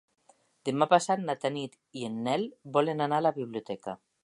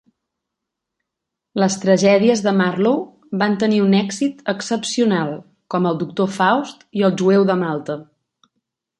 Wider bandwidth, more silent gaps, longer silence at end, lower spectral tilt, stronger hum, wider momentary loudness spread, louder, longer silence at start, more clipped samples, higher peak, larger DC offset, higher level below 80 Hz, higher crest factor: about the same, 11.5 kHz vs 11 kHz; neither; second, 0.3 s vs 0.95 s; about the same, -5 dB/octave vs -5.5 dB/octave; neither; first, 14 LU vs 11 LU; second, -30 LUFS vs -18 LUFS; second, 0.65 s vs 1.55 s; neither; second, -6 dBFS vs -2 dBFS; neither; second, -78 dBFS vs -66 dBFS; first, 24 dB vs 16 dB